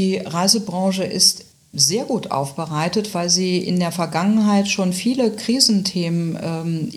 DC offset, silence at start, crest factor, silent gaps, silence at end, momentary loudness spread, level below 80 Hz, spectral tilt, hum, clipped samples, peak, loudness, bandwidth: under 0.1%; 0 s; 20 dB; none; 0 s; 9 LU; -62 dBFS; -4 dB/octave; none; under 0.1%; 0 dBFS; -18 LUFS; 15 kHz